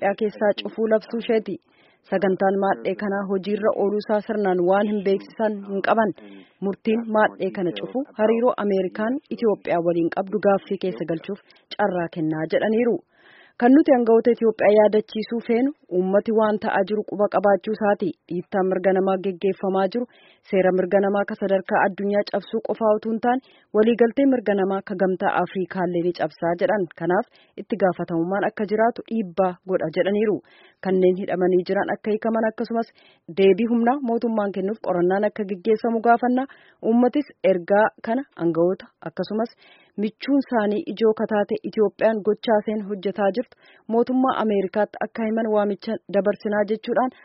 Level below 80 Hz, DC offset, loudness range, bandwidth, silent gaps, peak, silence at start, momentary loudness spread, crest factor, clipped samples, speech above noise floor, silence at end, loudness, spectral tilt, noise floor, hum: -68 dBFS; under 0.1%; 4 LU; 5.8 kHz; none; -4 dBFS; 0 s; 9 LU; 18 dB; under 0.1%; 31 dB; 0.15 s; -22 LUFS; -5.5 dB/octave; -53 dBFS; none